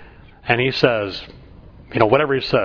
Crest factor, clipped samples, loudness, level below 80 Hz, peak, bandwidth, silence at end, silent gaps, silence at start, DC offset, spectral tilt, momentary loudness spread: 20 dB; under 0.1%; -18 LUFS; -46 dBFS; 0 dBFS; 5.4 kHz; 0 s; none; 0 s; under 0.1%; -7 dB/octave; 13 LU